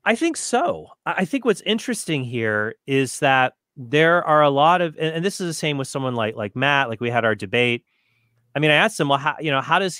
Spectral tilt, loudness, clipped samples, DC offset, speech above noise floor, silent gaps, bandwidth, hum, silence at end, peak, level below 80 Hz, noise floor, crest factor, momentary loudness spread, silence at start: -4.5 dB/octave; -20 LUFS; under 0.1%; under 0.1%; 45 dB; none; 16 kHz; none; 0 s; -2 dBFS; -66 dBFS; -65 dBFS; 20 dB; 8 LU; 0.05 s